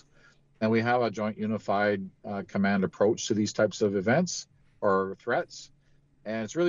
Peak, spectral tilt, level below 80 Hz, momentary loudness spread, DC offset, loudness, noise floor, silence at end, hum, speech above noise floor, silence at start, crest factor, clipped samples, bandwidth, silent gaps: -12 dBFS; -5.5 dB/octave; -66 dBFS; 11 LU; under 0.1%; -28 LUFS; -62 dBFS; 0 s; none; 35 dB; 0.6 s; 16 dB; under 0.1%; 7.8 kHz; none